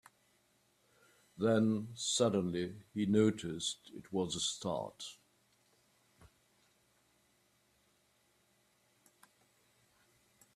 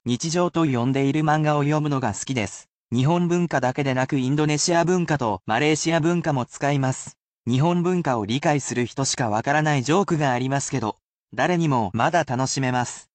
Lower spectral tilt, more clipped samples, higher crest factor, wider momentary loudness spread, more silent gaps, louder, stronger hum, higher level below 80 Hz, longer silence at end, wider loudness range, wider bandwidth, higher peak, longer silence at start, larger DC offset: about the same, -4.5 dB/octave vs -5 dB/octave; neither; first, 22 dB vs 16 dB; first, 11 LU vs 6 LU; second, none vs 2.69-2.87 s, 7.20-7.44 s, 11.02-11.14 s, 11.22-11.27 s; second, -35 LUFS vs -22 LUFS; neither; second, -74 dBFS vs -58 dBFS; first, 5.4 s vs 0.15 s; first, 13 LU vs 1 LU; first, 14 kHz vs 9 kHz; second, -18 dBFS vs -6 dBFS; first, 1.35 s vs 0.05 s; neither